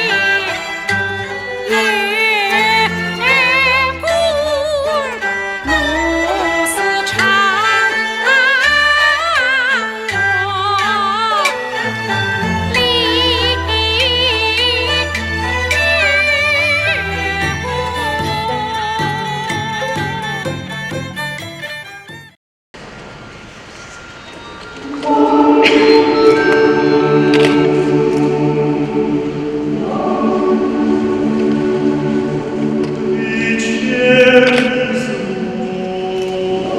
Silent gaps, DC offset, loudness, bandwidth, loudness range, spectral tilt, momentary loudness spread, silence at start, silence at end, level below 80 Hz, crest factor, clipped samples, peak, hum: 22.37-22.74 s; under 0.1%; -14 LUFS; 15.5 kHz; 9 LU; -4.5 dB/octave; 12 LU; 0 s; 0 s; -38 dBFS; 14 dB; under 0.1%; 0 dBFS; none